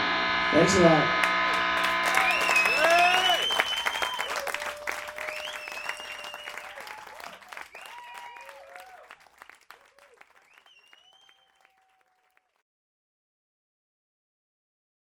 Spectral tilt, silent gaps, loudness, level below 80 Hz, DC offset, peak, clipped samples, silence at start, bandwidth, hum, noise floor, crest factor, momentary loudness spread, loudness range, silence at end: -3 dB/octave; none; -24 LUFS; -60 dBFS; under 0.1%; -6 dBFS; under 0.1%; 0 s; 17 kHz; none; -70 dBFS; 24 dB; 23 LU; 23 LU; 5.9 s